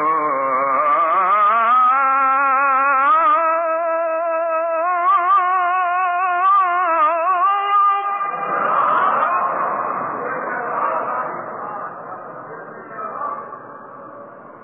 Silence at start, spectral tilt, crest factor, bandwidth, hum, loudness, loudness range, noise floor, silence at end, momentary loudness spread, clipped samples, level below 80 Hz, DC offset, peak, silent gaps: 0 s; -7.5 dB/octave; 10 dB; 3.7 kHz; none; -17 LUFS; 11 LU; -38 dBFS; 0 s; 18 LU; under 0.1%; -78 dBFS; under 0.1%; -8 dBFS; none